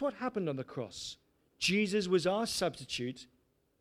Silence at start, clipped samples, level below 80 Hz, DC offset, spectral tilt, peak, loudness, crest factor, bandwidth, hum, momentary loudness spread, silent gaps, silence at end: 0 s; under 0.1%; -68 dBFS; under 0.1%; -4 dB/octave; -16 dBFS; -34 LUFS; 18 dB; 16 kHz; none; 13 LU; none; 0.55 s